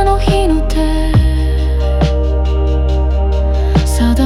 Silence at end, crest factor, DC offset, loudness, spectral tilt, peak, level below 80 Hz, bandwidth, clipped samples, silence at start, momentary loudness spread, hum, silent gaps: 0 s; 10 dB; under 0.1%; -14 LUFS; -7 dB/octave; 0 dBFS; -14 dBFS; 13 kHz; under 0.1%; 0 s; 3 LU; none; none